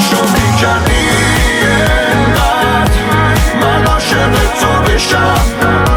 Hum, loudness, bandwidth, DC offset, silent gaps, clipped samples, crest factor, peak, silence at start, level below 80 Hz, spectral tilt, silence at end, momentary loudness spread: none; -10 LUFS; 19.5 kHz; under 0.1%; none; under 0.1%; 10 dB; 0 dBFS; 0 s; -18 dBFS; -4.5 dB/octave; 0 s; 1 LU